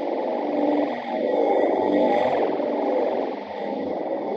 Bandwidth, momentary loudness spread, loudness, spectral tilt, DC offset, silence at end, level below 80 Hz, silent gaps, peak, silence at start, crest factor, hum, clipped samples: 6.6 kHz; 7 LU; -23 LUFS; -7 dB/octave; under 0.1%; 0 s; -70 dBFS; none; -8 dBFS; 0 s; 16 dB; none; under 0.1%